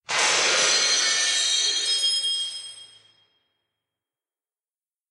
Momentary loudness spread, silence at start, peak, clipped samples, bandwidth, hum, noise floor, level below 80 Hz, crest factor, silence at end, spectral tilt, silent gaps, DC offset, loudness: 10 LU; 0.1 s; -8 dBFS; under 0.1%; 12 kHz; none; under -90 dBFS; -76 dBFS; 16 dB; 2.25 s; 2.5 dB/octave; none; under 0.1%; -20 LUFS